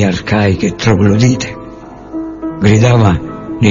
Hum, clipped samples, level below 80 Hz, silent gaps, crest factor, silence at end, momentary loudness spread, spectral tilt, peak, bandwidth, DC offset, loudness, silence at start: none; under 0.1%; -34 dBFS; none; 12 dB; 0 s; 17 LU; -6.5 dB/octave; 0 dBFS; 7.6 kHz; under 0.1%; -12 LUFS; 0 s